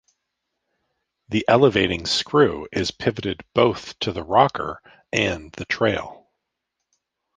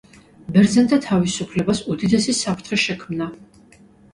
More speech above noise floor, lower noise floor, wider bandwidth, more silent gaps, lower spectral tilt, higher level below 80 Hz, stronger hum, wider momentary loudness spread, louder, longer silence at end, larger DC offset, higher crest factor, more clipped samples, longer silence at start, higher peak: first, 59 dB vs 31 dB; first, -80 dBFS vs -50 dBFS; second, 9.6 kHz vs 11.5 kHz; neither; about the same, -5 dB/octave vs -5 dB/octave; about the same, -48 dBFS vs -50 dBFS; neither; about the same, 12 LU vs 12 LU; about the same, -21 LUFS vs -19 LUFS; first, 1.2 s vs 0.7 s; neither; about the same, 20 dB vs 18 dB; neither; first, 1.3 s vs 0.5 s; about the same, -2 dBFS vs -2 dBFS